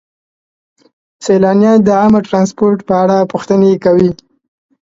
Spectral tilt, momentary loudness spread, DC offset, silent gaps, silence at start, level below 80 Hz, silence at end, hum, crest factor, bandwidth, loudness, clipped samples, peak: -7.5 dB/octave; 6 LU; under 0.1%; none; 1.2 s; -48 dBFS; 0.75 s; none; 12 dB; 7.8 kHz; -11 LUFS; under 0.1%; 0 dBFS